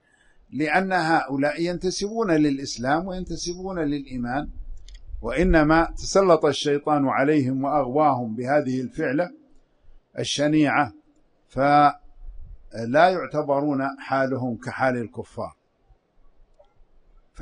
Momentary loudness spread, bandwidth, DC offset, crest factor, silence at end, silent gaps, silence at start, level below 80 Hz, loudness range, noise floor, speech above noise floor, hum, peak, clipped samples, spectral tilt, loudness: 14 LU; 10.5 kHz; under 0.1%; 20 dB; 0 s; none; 0.5 s; -40 dBFS; 6 LU; -60 dBFS; 38 dB; none; -4 dBFS; under 0.1%; -5.5 dB/octave; -23 LUFS